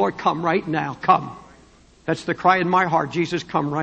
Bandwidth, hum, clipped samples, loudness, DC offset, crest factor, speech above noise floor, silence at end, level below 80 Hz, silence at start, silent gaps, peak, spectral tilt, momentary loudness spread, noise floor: 8.8 kHz; none; under 0.1%; -21 LUFS; under 0.1%; 18 dB; 31 dB; 0 s; -56 dBFS; 0 s; none; -2 dBFS; -6 dB/octave; 8 LU; -51 dBFS